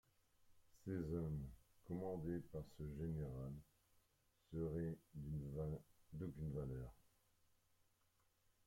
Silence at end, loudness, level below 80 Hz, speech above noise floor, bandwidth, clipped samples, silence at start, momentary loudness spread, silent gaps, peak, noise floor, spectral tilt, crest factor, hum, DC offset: 1.65 s; -50 LUFS; -64 dBFS; 33 dB; 16.5 kHz; under 0.1%; 0.4 s; 10 LU; none; -34 dBFS; -81 dBFS; -9.5 dB/octave; 16 dB; none; under 0.1%